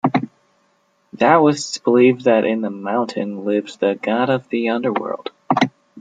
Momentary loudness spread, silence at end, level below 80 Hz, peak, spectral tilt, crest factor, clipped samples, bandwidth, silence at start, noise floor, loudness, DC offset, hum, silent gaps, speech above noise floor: 10 LU; 0 s; -66 dBFS; -2 dBFS; -5.5 dB/octave; 16 dB; under 0.1%; 9.4 kHz; 0.05 s; -62 dBFS; -18 LUFS; under 0.1%; none; none; 45 dB